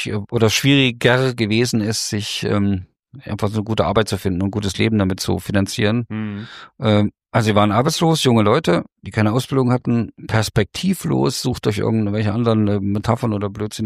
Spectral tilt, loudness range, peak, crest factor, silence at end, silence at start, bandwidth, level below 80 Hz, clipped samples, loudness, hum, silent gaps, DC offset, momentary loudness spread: -5.5 dB/octave; 3 LU; -2 dBFS; 16 dB; 0 s; 0 s; 15.5 kHz; -46 dBFS; under 0.1%; -18 LUFS; none; 2.99-3.03 s; under 0.1%; 8 LU